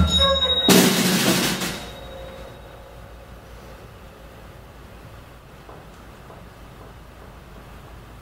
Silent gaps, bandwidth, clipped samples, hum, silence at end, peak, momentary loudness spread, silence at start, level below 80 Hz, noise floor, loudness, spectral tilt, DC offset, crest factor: none; 16.5 kHz; under 0.1%; none; 0 s; -2 dBFS; 27 LU; 0 s; -38 dBFS; -43 dBFS; -17 LUFS; -3.5 dB/octave; under 0.1%; 24 dB